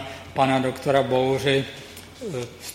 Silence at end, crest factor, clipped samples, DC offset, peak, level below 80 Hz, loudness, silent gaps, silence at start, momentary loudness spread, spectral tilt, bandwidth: 0 s; 18 dB; under 0.1%; under 0.1%; -6 dBFS; -56 dBFS; -23 LUFS; none; 0 s; 15 LU; -5.5 dB/octave; 16.5 kHz